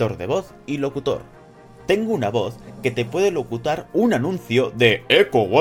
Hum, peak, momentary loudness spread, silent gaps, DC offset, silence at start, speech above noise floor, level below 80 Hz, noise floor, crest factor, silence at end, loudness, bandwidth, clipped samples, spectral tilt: none; 0 dBFS; 10 LU; none; under 0.1%; 0 s; 25 dB; -52 dBFS; -45 dBFS; 20 dB; 0 s; -21 LUFS; 16.5 kHz; under 0.1%; -5.5 dB/octave